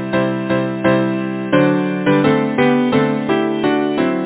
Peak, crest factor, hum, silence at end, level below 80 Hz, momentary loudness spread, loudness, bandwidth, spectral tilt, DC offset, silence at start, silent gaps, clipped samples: 0 dBFS; 16 dB; none; 0 s; -52 dBFS; 4 LU; -16 LUFS; 4 kHz; -11 dB/octave; under 0.1%; 0 s; none; under 0.1%